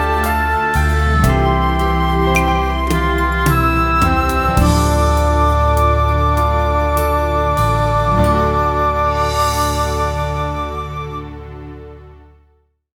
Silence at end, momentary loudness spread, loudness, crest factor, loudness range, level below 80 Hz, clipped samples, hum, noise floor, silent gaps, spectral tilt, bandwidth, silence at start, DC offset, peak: 0.8 s; 9 LU; -15 LUFS; 14 dB; 5 LU; -20 dBFS; under 0.1%; none; -57 dBFS; none; -6 dB/octave; 18.5 kHz; 0 s; under 0.1%; 0 dBFS